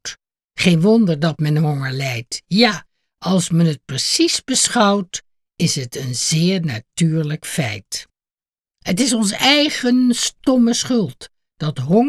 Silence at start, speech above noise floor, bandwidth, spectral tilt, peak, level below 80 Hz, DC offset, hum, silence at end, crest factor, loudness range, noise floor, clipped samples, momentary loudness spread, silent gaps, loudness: 0.05 s; over 73 dB; 14 kHz; -4.5 dB/octave; -2 dBFS; -56 dBFS; under 0.1%; none; 0 s; 16 dB; 4 LU; under -90 dBFS; under 0.1%; 13 LU; 0.45-0.49 s; -17 LUFS